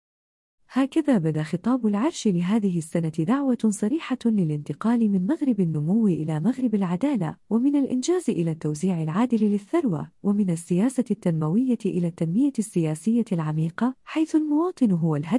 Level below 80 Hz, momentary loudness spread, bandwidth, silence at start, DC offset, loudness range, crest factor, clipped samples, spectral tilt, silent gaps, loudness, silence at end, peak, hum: -68 dBFS; 4 LU; 12 kHz; 0.7 s; under 0.1%; 1 LU; 14 dB; under 0.1%; -7.5 dB/octave; none; -24 LUFS; 0 s; -10 dBFS; none